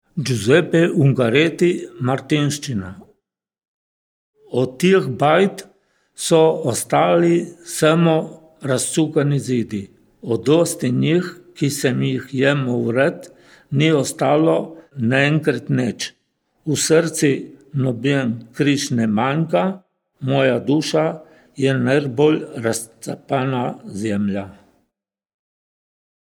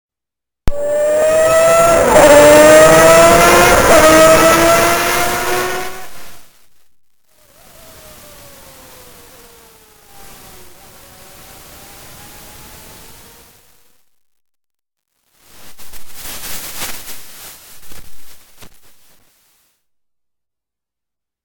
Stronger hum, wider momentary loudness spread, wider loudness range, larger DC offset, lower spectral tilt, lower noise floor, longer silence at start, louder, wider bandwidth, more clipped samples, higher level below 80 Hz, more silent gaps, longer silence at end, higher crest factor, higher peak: neither; second, 12 LU vs 24 LU; second, 4 LU vs 23 LU; neither; first, -5.5 dB/octave vs -3 dB/octave; second, -78 dBFS vs -86 dBFS; second, 0.15 s vs 0.65 s; second, -18 LUFS vs -8 LUFS; about the same, 18.5 kHz vs 20 kHz; second, under 0.1% vs 0.2%; second, -66 dBFS vs -34 dBFS; first, 3.68-4.33 s vs none; second, 1.75 s vs 2.8 s; about the same, 18 dB vs 14 dB; about the same, -2 dBFS vs 0 dBFS